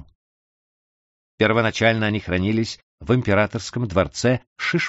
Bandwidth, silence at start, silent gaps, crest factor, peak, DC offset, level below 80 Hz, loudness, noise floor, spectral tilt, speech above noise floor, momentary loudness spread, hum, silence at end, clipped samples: 8 kHz; 1.4 s; 2.83-2.98 s, 4.47-4.56 s; 20 dB; -2 dBFS; under 0.1%; -48 dBFS; -21 LUFS; under -90 dBFS; -4.5 dB/octave; over 69 dB; 6 LU; none; 0 s; under 0.1%